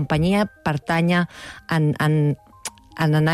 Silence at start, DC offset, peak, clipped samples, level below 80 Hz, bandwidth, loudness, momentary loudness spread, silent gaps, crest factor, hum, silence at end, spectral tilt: 0 s; under 0.1%; -10 dBFS; under 0.1%; -46 dBFS; 13.5 kHz; -21 LUFS; 15 LU; none; 12 dB; none; 0 s; -6.5 dB/octave